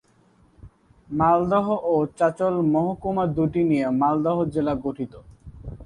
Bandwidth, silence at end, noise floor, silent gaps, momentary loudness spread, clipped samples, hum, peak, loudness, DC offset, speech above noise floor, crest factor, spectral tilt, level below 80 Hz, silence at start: 10.5 kHz; 0 s; -58 dBFS; none; 11 LU; under 0.1%; none; -8 dBFS; -22 LUFS; under 0.1%; 37 dB; 16 dB; -9 dB/octave; -48 dBFS; 0.65 s